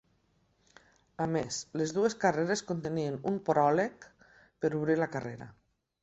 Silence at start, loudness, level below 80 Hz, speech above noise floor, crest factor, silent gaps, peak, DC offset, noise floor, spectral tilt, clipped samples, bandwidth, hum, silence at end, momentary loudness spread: 1.2 s; -31 LUFS; -68 dBFS; 41 dB; 20 dB; none; -12 dBFS; under 0.1%; -71 dBFS; -5.5 dB/octave; under 0.1%; 8.4 kHz; none; 0.5 s; 9 LU